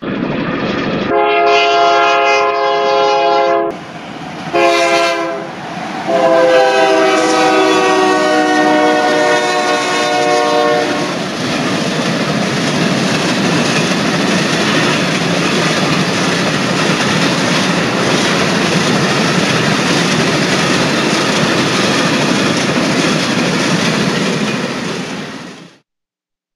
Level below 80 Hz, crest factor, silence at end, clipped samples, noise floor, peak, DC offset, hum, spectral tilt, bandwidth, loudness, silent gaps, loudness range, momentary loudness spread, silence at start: -50 dBFS; 14 dB; 0.9 s; under 0.1%; -83 dBFS; 0 dBFS; under 0.1%; none; -4 dB/octave; 14 kHz; -12 LUFS; none; 3 LU; 8 LU; 0 s